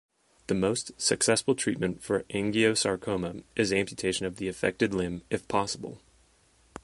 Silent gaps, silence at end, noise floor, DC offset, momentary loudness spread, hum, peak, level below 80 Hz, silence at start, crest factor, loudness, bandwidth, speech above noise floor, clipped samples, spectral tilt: none; 0.05 s; -64 dBFS; under 0.1%; 9 LU; none; -10 dBFS; -56 dBFS; 0.5 s; 20 dB; -28 LUFS; 11.5 kHz; 35 dB; under 0.1%; -3.5 dB/octave